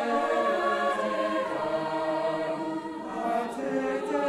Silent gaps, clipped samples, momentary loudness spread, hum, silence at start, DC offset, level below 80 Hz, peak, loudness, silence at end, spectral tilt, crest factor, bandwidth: none; under 0.1%; 7 LU; none; 0 s; under 0.1%; -66 dBFS; -14 dBFS; -29 LUFS; 0 s; -5 dB/octave; 14 dB; 13.5 kHz